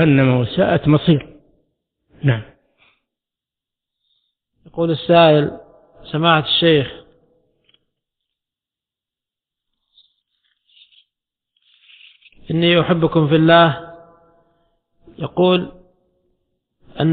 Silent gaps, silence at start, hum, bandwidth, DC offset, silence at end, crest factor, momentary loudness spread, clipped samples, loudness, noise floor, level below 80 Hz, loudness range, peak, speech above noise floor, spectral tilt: none; 0 s; none; 4.6 kHz; under 0.1%; 0 s; 18 dB; 15 LU; under 0.1%; -15 LUFS; -88 dBFS; -50 dBFS; 10 LU; 0 dBFS; 74 dB; -11 dB/octave